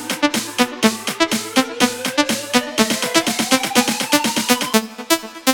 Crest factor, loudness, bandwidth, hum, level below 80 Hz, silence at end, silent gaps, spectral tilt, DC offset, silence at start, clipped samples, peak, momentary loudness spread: 18 dB; -17 LUFS; 17.5 kHz; none; -56 dBFS; 0 s; none; -2 dB/octave; under 0.1%; 0 s; under 0.1%; 0 dBFS; 4 LU